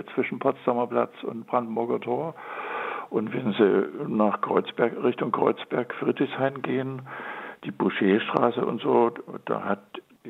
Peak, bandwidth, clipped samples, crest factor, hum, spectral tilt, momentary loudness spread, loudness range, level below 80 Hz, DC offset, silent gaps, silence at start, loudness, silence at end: -4 dBFS; 4.6 kHz; under 0.1%; 22 dB; none; -8.5 dB/octave; 12 LU; 3 LU; -78 dBFS; under 0.1%; none; 0 s; -26 LUFS; 0 s